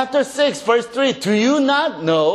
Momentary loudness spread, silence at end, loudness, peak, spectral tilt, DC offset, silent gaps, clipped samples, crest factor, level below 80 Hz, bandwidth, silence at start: 3 LU; 0 s; -17 LUFS; -2 dBFS; -4.5 dB/octave; under 0.1%; none; under 0.1%; 16 dB; -62 dBFS; 13 kHz; 0 s